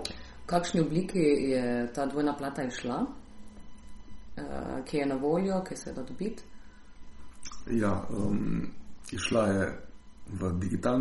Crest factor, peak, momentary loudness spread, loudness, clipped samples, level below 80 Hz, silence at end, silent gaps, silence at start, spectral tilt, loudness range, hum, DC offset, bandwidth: 18 dB; -14 dBFS; 17 LU; -31 LUFS; under 0.1%; -50 dBFS; 0 s; none; 0 s; -6 dB/octave; 5 LU; none; under 0.1%; 11.5 kHz